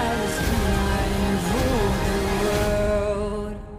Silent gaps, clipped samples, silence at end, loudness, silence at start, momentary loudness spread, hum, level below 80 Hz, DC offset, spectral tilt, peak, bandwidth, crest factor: none; under 0.1%; 0 s; -23 LUFS; 0 s; 3 LU; none; -28 dBFS; under 0.1%; -5.5 dB/octave; -10 dBFS; 16 kHz; 14 dB